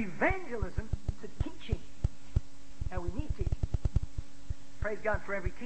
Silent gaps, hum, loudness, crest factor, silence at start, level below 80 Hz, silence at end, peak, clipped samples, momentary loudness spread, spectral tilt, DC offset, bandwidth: none; none; -37 LUFS; 20 dB; 0 s; -38 dBFS; 0 s; -12 dBFS; under 0.1%; 12 LU; -7 dB/octave; 2%; 8.4 kHz